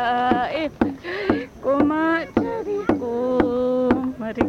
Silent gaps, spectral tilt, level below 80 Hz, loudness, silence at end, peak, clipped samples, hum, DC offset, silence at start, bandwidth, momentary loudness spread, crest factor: none; -7 dB/octave; -46 dBFS; -22 LUFS; 0 s; -4 dBFS; under 0.1%; none; under 0.1%; 0 s; 8.6 kHz; 5 LU; 18 dB